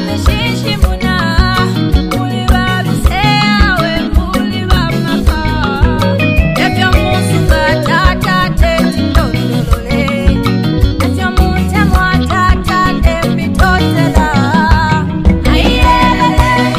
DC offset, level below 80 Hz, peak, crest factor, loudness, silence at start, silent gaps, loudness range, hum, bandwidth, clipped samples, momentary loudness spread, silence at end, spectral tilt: under 0.1%; -16 dBFS; 0 dBFS; 10 dB; -11 LUFS; 0 s; none; 2 LU; none; 15.5 kHz; 0.6%; 4 LU; 0 s; -6 dB/octave